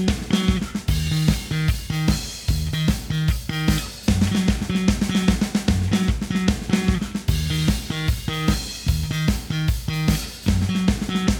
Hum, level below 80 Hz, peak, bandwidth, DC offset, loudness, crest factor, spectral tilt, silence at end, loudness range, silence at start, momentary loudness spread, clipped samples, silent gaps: none; -28 dBFS; -4 dBFS; over 20 kHz; under 0.1%; -22 LUFS; 18 dB; -5.5 dB/octave; 0 s; 2 LU; 0 s; 4 LU; under 0.1%; none